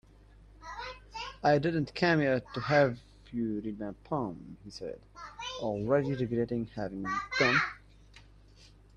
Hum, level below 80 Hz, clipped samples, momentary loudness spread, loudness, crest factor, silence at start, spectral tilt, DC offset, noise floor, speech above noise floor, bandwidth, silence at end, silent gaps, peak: none; -58 dBFS; under 0.1%; 18 LU; -31 LUFS; 20 dB; 0.6 s; -6 dB/octave; under 0.1%; -57 dBFS; 26 dB; 9.8 kHz; 0.3 s; none; -12 dBFS